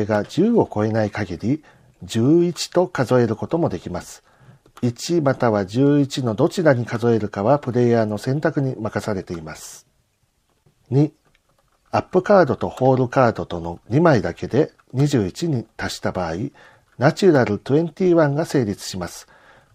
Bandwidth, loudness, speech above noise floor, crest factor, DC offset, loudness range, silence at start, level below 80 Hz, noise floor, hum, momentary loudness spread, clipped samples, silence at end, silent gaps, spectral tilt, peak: 15.5 kHz; -20 LUFS; 46 dB; 20 dB; under 0.1%; 5 LU; 0 s; -52 dBFS; -66 dBFS; none; 12 LU; under 0.1%; 0.5 s; none; -7 dB/octave; 0 dBFS